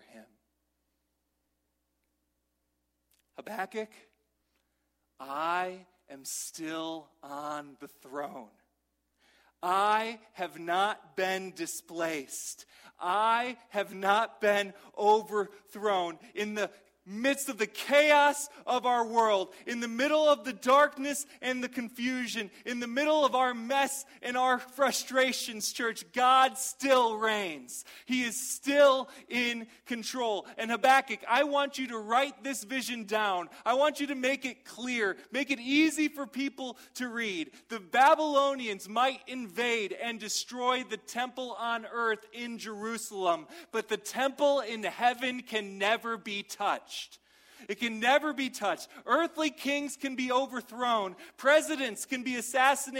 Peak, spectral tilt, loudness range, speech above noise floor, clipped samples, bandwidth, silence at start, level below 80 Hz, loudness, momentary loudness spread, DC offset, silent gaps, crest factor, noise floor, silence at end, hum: -10 dBFS; -2 dB/octave; 10 LU; 50 dB; under 0.1%; 16 kHz; 0.15 s; -80 dBFS; -30 LUFS; 14 LU; under 0.1%; none; 20 dB; -80 dBFS; 0 s; none